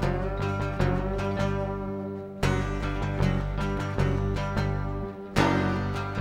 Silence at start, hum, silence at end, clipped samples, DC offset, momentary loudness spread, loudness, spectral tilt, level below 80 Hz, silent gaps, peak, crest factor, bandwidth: 0 s; 50 Hz at -45 dBFS; 0 s; under 0.1%; under 0.1%; 6 LU; -28 LUFS; -7 dB/octave; -36 dBFS; none; -6 dBFS; 22 dB; 14 kHz